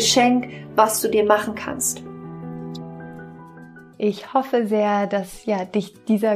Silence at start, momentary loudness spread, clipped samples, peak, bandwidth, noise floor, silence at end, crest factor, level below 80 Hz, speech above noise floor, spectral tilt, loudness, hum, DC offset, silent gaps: 0 s; 19 LU; under 0.1%; -2 dBFS; 15.5 kHz; -43 dBFS; 0 s; 20 dB; -58 dBFS; 23 dB; -3.5 dB/octave; -21 LUFS; none; under 0.1%; none